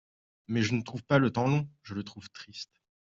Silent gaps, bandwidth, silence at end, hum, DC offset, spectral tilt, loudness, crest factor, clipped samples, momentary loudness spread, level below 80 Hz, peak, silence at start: none; 7.6 kHz; 0.35 s; none; under 0.1%; -6.5 dB/octave; -30 LUFS; 22 dB; under 0.1%; 18 LU; -66 dBFS; -10 dBFS; 0.5 s